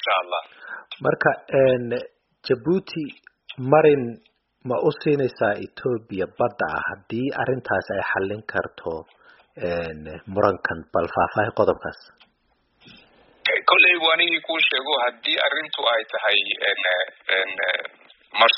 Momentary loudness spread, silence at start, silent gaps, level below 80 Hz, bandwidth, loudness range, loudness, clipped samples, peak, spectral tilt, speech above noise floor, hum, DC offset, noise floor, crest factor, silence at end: 15 LU; 0 s; none; -58 dBFS; 5.8 kHz; 7 LU; -22 LUFS; under 0.1%; -2 dBFS; -1.5 dB/octave; 44 dB; none; under 0.1%; -67 dBFS; 22 dB; 0 s